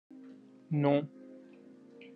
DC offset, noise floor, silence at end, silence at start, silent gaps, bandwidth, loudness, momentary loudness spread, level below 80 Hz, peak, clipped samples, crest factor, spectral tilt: under 0.1%; -55 dBFS; 0.05 s; 0.15 s; none; 4.8 kHz; -31 LUFS; 25 LU; -88 dBFS; -16 dBFS; under 0.1%; 20 dB; -10 dB/octave